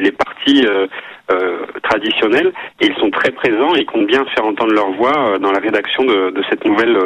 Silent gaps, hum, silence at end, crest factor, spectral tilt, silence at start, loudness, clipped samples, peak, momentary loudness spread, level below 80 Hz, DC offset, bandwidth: none; none; 0 s; 14 dB; -5 dB/octave; 0 s; -15 LUFS; under 0.1%; 0 dBFS; 5 LU; -54 dBFS; under 0.1%; 9.8 kHz